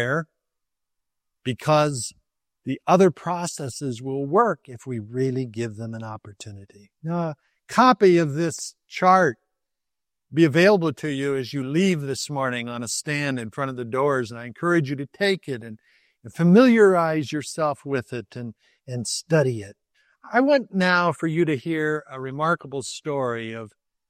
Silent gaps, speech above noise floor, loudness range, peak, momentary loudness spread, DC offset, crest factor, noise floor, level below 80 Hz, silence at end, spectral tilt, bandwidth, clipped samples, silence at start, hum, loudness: none; 65 dB; 6 LU; -2 dBFS; 17 LU; under 0.1%; 20 dB; -87 dBFS; -68 dBFS; 0.4 s; -5.5 dB/octave; 14.5 kHz; under 0.1%; 0 s; none; -22 LUFS